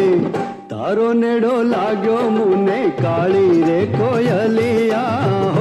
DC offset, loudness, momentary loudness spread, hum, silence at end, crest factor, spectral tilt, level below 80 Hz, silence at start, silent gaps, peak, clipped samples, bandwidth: under 0.1%; -16 LUFS; 4 LU; none; 0 s; 10 dB; -8 dB/octave; -50 dBFS; 0 s; none; -4 dBFS; under 0.1%; 12 kHz